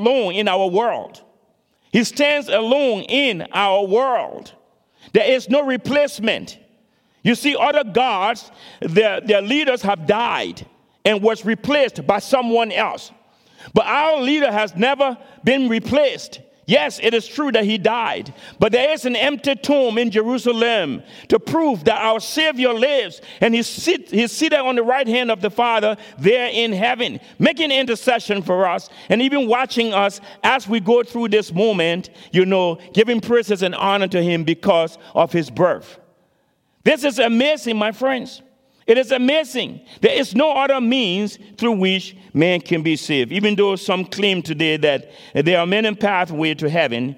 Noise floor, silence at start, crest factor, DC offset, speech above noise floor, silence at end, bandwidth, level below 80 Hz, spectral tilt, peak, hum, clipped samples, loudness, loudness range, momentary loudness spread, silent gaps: -64 dBFS; 0 s; 18 dB; under 0.1%; 46 dB; 0.05 s; 16.5 kHz; -60 dBFS; -4.5 dB/octave; 0 dBFS; none; under 0.1%; -18 LUFS; 1 LU; 6 LU; none